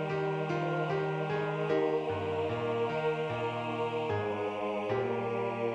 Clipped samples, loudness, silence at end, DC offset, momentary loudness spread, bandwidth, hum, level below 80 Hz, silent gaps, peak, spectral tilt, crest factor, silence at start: under 0.1%; -33 LUFS; 0 s; under 0.1%; 3 LU; 9.2 kHz; none; -70 dBFS; none; -18 dBFS; -7.5 dB/octave; 14 dB; 0 s